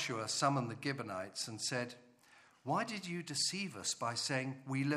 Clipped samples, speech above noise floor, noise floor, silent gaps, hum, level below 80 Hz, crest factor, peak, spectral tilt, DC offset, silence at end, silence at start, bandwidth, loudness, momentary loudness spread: under 0.1%; 27 dB; -65 dBFS; none; none; -82 dBFS; 20 dB; -18 dBFS; -3.5 dB/octave; under 0.1%; 0 s; 0 s; 14.5 kHz; -38 LUFS; 8 LU